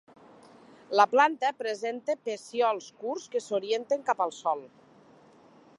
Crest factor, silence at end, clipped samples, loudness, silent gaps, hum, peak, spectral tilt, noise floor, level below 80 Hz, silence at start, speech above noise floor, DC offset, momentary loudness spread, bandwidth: 22 dB; 1.1 s; under 0.1%; -28 LUFS; none; none; -8 dBFS; -3 dB/octave; -57 dBFS; -86 dBFS; 0.9 s; 29 dB; under 0.1%; 11 LU; 11.5 kHz